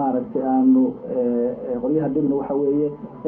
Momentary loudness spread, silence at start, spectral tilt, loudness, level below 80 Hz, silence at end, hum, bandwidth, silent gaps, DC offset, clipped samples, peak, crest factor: 8 LU; 0 s; -13 dB/octave; -21 LUFS; -56 dBFS; 0 s; none; 2.9 kHz; none; under 0.1%; under 0.1%; -8 dBFS; 12 dB